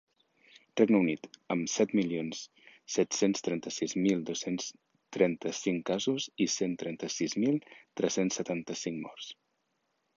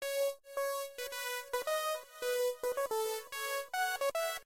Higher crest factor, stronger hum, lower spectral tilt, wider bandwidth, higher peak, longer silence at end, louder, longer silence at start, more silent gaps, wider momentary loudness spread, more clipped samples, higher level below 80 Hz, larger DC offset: first, 22 dB vs 14 dB; neither; first, -4.5 dB/octave vs 1.5 dB/octave; second, 7.6 kHz vs 16 kHz; first, -10 dBFS vs -22 dBFS; first, 0.85 s vs 0 s; first, -31 LUFS vs -36 LUFS; first, 0.75 s vs 0 s; neither; first, 12 LU vs 4 LU; neither; about the same, -74 dBFS vs -74 dBFS; neither